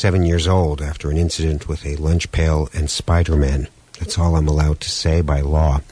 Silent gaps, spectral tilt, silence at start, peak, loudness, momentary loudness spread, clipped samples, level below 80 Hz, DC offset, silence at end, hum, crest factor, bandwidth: none; -6 dB/octave; 0 s; -4 dBFS; -19 LUFS; 8 LU; under 0.1%; -22 dBFS; under 0.1%; 0.1 s; none; 12 dB; 10.5 kHz